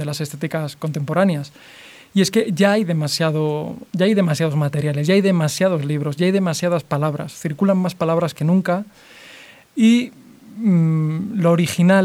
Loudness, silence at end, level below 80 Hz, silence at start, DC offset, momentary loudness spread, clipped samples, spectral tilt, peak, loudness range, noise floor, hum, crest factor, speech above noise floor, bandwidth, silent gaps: -19 LUFS; 0 s; -64 dBFS; 0 s; under 0.1%; 10 LU; under 0.1%; -6.5 dB/octave; -2 dBFS; 2 LU; -44 dBFS; none; 16 dB; 26 dB; 15.5 kHz; none